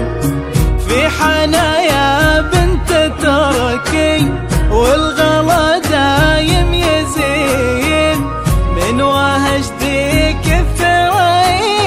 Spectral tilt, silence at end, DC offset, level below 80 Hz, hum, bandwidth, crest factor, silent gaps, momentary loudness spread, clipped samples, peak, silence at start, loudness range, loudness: -5 dB/octave; 0 s; under 0.1%; -20 dBFS; none; 16 kHz; 12 dB; none; 4 LU; under 0.1%; 0 dBFS; 0 s; 2 LU; -12 LUFS